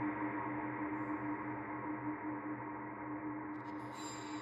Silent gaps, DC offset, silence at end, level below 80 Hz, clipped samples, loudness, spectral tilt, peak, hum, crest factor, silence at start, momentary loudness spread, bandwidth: none; under 0.1%; 0 s; -70 dBFS; under 0.1%; -42 LUFS; -6 dB/octave; -28 dBFS; none; 14 dB; 0 s; 5 LU; 10.5 kHz